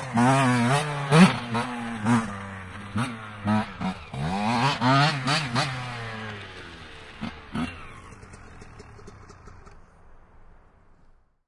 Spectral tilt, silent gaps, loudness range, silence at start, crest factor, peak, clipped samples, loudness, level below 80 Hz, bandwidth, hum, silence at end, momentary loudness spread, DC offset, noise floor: -5.5 dB/octave; none; 16 LU; 0 s; 24 dB; -4 dBFS; under 0.1%; -24 LUFS; -52 dBFS; 11.5 kHz; none; 1.3 s; 23 LU; under 0.1%; -57 dBFS